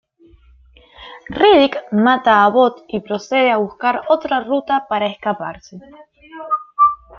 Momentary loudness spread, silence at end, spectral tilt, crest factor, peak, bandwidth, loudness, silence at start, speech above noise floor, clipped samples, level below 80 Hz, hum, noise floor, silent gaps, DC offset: 15 LU; 0.25 s; -5.5 dB/octave; 16 dB; -2 dBFS; 7 kHz; -16 LUFS; 1 s; 33 dB; under 0.1%; -52 dBFS; none; -49 dBFS; none; under 0.1%